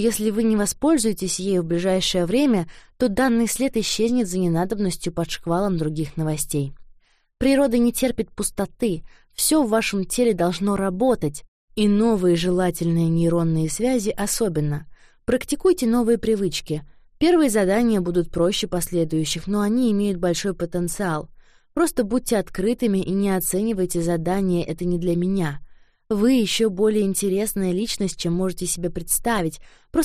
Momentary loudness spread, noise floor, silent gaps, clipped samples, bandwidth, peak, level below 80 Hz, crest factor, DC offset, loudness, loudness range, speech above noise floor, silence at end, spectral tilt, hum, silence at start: 7 LU; -51 dBFS; 11.48-11.68 s; under 0.1%; 15.5 kHz; -8 dBFS; -42 dBFS; 14 dB; under 0.1%; -22 LUFS; 3 LU; 31 dB; 0 s; -5 dB/octave; none; 0 s